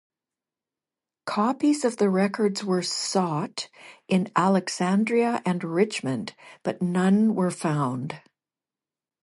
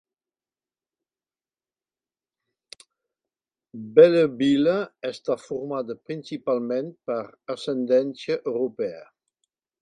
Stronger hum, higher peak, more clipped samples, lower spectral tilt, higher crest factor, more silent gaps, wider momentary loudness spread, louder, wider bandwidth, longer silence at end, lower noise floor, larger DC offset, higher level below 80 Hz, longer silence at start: neither; second, -8 dBFS vs -2 dBFS; neither; about the same, -5.5 dB/octave vs -6.5 dB/octave; second, 18 dB vs 24 dB; neither; second, 11 LU vs 16 LU; about the same, -25 LUFS vs -24 LUFS; first, 11.5 kHz vs 10 kHz; first, 1.05 s vs 0.8 s; about the same, under -90 dBFS vs under -90 dBFS; neither; about the same, -72 dBFS vs -72 dBFS; second, 1.25 s vs 3.75 s